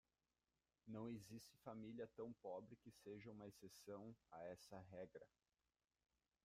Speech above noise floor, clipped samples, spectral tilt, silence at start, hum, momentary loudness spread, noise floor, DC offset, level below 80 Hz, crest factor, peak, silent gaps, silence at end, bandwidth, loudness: over 32 dB; under 0.1%; -6 dB/octave; 0.85 s; none; 7 LU; under -90 dBFS; under 0.1%; -86 dBFS; 18 dB; -42 dBFS; none; 1.15 s; 15.5 kHz; -58 LUFS